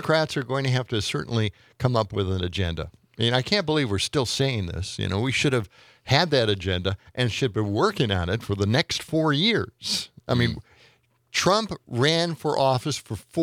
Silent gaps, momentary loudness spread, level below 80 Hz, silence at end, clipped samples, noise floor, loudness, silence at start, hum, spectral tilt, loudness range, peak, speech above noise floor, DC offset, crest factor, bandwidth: none; 8 LU; -52 dBFS; 0 s; under 0.1%; -60 dBFS; -24 LUFS; 0 s; none; -5 dB/octave; 1 LU; -4 dBFS; 36 dB; under 0.1%; 22 dB; 15.5 kHz